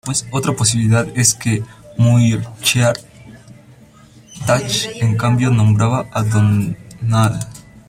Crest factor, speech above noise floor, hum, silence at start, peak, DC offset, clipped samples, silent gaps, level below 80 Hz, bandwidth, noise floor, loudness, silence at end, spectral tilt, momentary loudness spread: 16 dB; 29 dB; none; 0.05 s; 0 dBFS; under 0.1%; under 0.1%; none; -46 dBFS; 15.5 kHz; -44 dBFS; -16 LUFS; 0.3 s; -5 dB/octave; 10 LU